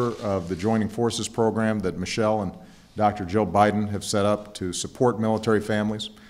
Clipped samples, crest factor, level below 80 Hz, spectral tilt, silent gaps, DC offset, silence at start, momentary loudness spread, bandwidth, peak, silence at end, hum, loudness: under 0.1%; 20 dB; -54 dBFS; -5.5 dB/octave; none; under 0.1%; 0 s; 7 LU; 15 kHz; -4 dBFS; 0 s; none; -24 LUFS